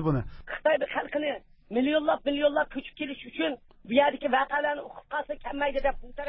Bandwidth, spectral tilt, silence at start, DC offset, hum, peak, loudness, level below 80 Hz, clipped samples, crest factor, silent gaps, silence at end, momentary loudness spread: 5.6 kHz; -9.5 dB/octave; 0 s; under 0.1%; none; -8 dBFS; -28 LUFS; -50 dBFS; under 0.1%; 20 dB; none; 0 s; 11 LU